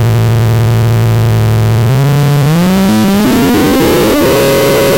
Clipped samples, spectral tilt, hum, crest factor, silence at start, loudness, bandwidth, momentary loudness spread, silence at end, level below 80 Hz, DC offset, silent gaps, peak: under 0.1%; -6 dB/octave; none; 6 dB; 0 s; -9 LUFS; 17.5 kHz; 1 LU; 0 s; -28 dBFS; 1%; none; -2 dBFS